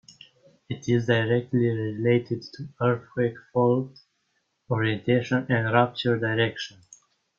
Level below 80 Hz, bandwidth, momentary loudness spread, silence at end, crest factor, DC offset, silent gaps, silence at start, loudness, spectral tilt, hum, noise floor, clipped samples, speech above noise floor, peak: -62 dBFS; 7.2 kHz; 11 LU; 0.7 s; 22 dB; under 0.1%; none; 0.7 s; -25 LUFS; -7 dB/octave; none; -74 dBFS; under 0.1%; 49 dB; -4 dBFS